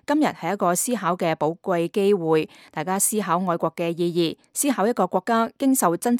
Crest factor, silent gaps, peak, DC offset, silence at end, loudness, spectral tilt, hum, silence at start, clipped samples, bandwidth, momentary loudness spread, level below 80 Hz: 16 dB; none; -6 dBFS; under 0.1%; 0 s; -22 LUFS; -4.5 dB/octave; none; 0.1 s; under 0.1%; 17.5 kHz; 5 LU; -70 dBFS